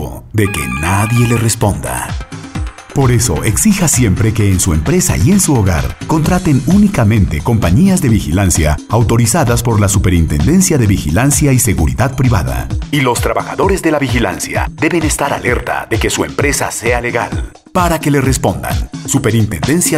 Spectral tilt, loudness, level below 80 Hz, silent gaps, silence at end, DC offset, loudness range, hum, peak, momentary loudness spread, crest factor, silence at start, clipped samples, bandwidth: -5 dB/octave; -12 LUFS; -24 dBFS; none; 0 s; under 0.1%; 3 LU; none; -2 dBFS; 7 LU; 10 dB; 0 s; under 0.1%; 16 kHz